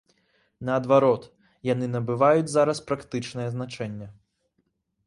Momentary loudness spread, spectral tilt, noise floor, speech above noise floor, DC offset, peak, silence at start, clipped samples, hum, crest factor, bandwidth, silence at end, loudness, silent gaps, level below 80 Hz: 15 LU; -6.5 dB/octave; -74 dBFS; 50 dB; under 0.1%; -6 dBFS; 0.6 s; under 0.1%; none; 20 dB; 11.5 kHz; 0.95 s; -25 LUFS; none; -62 dBFS